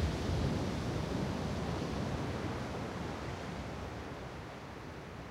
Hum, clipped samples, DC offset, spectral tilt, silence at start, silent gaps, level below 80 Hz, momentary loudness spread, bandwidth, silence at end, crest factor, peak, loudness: none; under 0.1%; under 0.1%; -6 dB/octave; 0 s; none; -48 dBFS; 11 LU; 16 kHz; 0 s; 16 dB; -22 dBFS; -39 LUFS